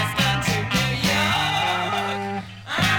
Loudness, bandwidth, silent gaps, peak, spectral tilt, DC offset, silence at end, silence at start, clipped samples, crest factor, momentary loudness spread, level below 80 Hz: -22 LUFS; 19 kHz; none; -8 dBFS; -4 dB/octave; under 0.1%; 0 s; 0 s; under 0.1%; 16 dB; 8 LU; -44 dBFS